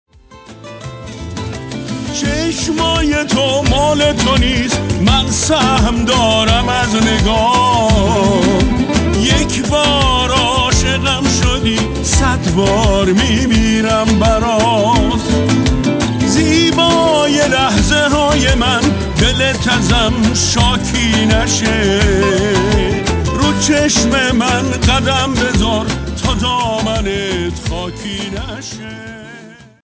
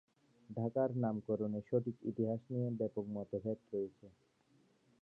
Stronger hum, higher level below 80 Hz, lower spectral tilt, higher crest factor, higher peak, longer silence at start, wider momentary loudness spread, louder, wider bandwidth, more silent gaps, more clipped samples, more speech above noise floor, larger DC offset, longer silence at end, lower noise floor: neither; first, -22 dBFS vs -76 dBFS; second, -4 dB/octave vs -11.5 dB/octave; second, 12 dB vs 18 dB; first, -2 dBFS vs -22 dBFS; second, 0.3 s vs 0.5 s; first, 10 LU vs 7 LU; first, -13 LUFS vs -40 LUFS; first, 8 kHz vs 4 kHz; neither; neither; second, 25 dB vs 34 dB; neither; second, 0.3 s vs 0.95 s; second, -38 dBFS vs -72 dBFS